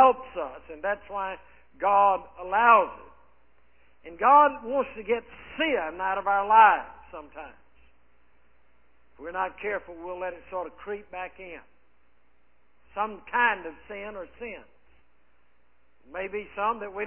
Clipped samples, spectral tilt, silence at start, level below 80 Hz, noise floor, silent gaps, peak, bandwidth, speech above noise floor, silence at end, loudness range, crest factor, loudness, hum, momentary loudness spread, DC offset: under 0.1%; -1 dB/octave; 0 s; -60 dBFS; -69 dBFS; none; -4 dBFS; 3.3 kHz; 43 dB; 0 s; 14 LU; 22 dB; -25 LUFS; none; 23 LU; 0.2%